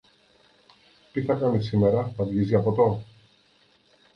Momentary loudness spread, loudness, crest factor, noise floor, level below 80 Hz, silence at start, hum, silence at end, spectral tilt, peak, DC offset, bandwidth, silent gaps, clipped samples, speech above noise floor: 8 LU; -24 LUFS; 18 dB; -62 dBFS; -54 dBFS; 1.15 s; none; 1.1 s; -9.5 dB/octave; -8 dBFS; under 0.1%; 6.2 kHz; none; under 0.1%; 39 dB